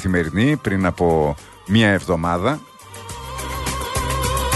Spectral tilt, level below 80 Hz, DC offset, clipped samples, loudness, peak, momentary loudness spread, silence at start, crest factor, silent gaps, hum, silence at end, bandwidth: -5 dB/octave; -34 dBFS; under 0.1%; under 0.1%; -20 LUFS; -4 dBFS; 16 LU; 0 s; 16 dB; none; none; 0 s; 12.5 kHz